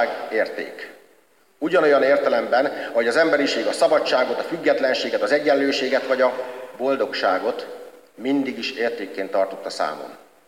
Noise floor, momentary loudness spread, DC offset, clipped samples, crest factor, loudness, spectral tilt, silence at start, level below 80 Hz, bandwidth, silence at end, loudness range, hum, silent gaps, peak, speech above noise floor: -58 dBFS; 13 LU; under 0.1%; under 0.1%; 16 dB; -21 LUFS; -3.5 dB/octave; 0 s; -72 dBFS; 16 kHz; 0.3 s; 5 LU; none; none; -6 dBFS; 37 dB